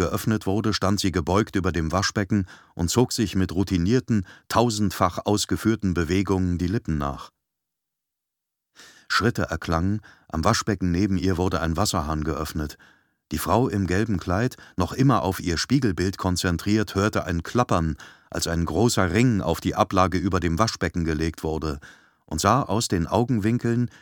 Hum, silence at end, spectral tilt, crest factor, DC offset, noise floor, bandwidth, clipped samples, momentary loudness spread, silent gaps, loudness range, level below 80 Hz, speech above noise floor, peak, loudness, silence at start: none; 0.15 s; -5.5 dB/octave; 20 dB; under 0.1%; -84 dBFS; 19 kHz; under 0.1%; 7 LU; none; 4 LU; -40 dBFS; 61 dB; -2 dBFS; -24 LUFS; 0 s